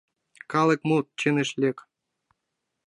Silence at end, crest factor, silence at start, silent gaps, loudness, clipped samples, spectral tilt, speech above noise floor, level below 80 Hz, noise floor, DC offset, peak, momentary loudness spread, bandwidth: 1.1 s; 20 dB; 0.5 s; none; -25 LUFS; under 0.1%; -5.5 dB/octave; 58 dB; -74 dBFS; -82 dBFS; under 0.1%; -8 dBFS; 6 LU; 11 kHz